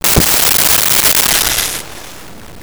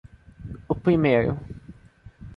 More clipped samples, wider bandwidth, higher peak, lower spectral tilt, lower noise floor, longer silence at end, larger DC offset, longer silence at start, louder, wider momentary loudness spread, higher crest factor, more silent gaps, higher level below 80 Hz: neither; first, over 20 kHz vs 5.2 kHz; first, 0 dBFS vs -6 dBFS; second, -1 dB/octave vs -9.5 dB/octave; second, -33 dBFS vs -49 dBFS; about the same, 0 s vs 0 s; neither; second, 0.05 s vs 0.4 s; first, -8 LUFS vs -23 LUFS; second, 16 LU vs 23 LU; second, 12 dB vs 18 dB; neither; first, -30 dBFS vs -46 dBFS